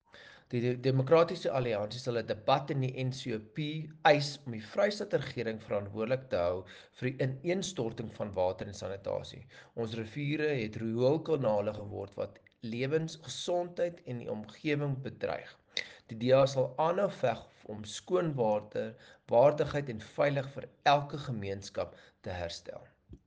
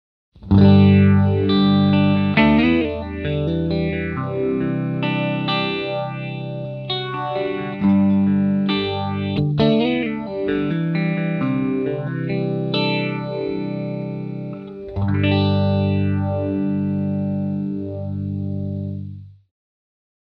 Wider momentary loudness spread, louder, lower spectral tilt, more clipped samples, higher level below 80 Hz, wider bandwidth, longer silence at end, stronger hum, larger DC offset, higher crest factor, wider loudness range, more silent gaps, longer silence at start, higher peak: first, 15 LU vs 12 LU; second, -33 LUFS vs -20 LUFS; second, -6 dB/octave vs -9.5 dB/octave; neither; second, -66 dBFS vs -44 dBFS; first, 9.6 kHz vs 5.2 kHz; second, 0.1 s vs 0.9 s; second, none vs 50 Hz at -50 dBFS; neither; about the same, 22 dB vs 20 dB; about the same, 5 LU vs 7 LU; neither; second, 0.15 s vs 0.4 s; second, -10 dBFS vs 0 dBFS